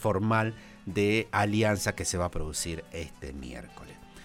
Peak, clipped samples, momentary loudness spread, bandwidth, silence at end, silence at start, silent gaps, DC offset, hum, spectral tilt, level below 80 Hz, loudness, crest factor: -12 dBFS; under 0.1%; 18 LU; 16.5 kHz; 0 s; 0 s; none; under 0.1%; none; -4.5 dB/octave; -46 dBFS; -29 LUFS; 18 dB